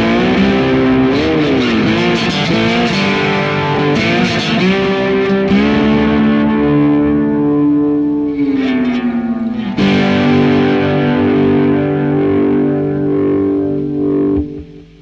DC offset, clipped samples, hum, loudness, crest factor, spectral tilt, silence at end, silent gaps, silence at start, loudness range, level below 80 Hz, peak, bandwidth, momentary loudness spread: under 0.1%; under 0.1%; none; -13 LUFS; 10 dB; -7 dB/octave; 0.2 s; none; 0 s; 2 LU; -36 dBFS; -2 dBFS; 7.8 kHz; 4 LU